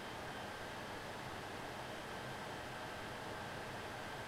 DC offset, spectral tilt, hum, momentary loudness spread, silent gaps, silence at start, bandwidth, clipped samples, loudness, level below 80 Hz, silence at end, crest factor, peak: under 0.1%; -4 dB/octave; none; 1 LU; none; 0 s; 16 kHz; under 0.1%; -46 LUFS; -64 dBFS; 0 s; 12 dB; -34 dBFS